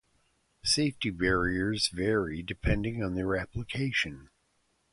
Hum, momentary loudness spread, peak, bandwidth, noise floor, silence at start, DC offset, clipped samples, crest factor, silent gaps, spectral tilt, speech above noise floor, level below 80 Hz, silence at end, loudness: none; 7 LU; -12 dBFS; 11.5 kHz; -73 dBFS; 0.65 s; under 0.1%; under 0.1%; 20 dB; none; -4.5 dB/octave; 43 dB; -44 dBFS; 0.65 s; -30 LUFS